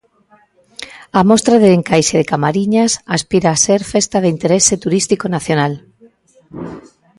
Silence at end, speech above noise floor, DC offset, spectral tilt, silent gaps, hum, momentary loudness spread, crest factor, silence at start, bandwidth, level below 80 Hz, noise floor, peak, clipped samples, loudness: 0.4 s; 39 dB; under 0.1%; -4.5 dB/octave; none; none; 20 LU; 14 dB; 0.8 s; 11.5 kHz; -48 dBFS; -52 dBFS; 0 dBFS; under 0.1%; -13 LUFS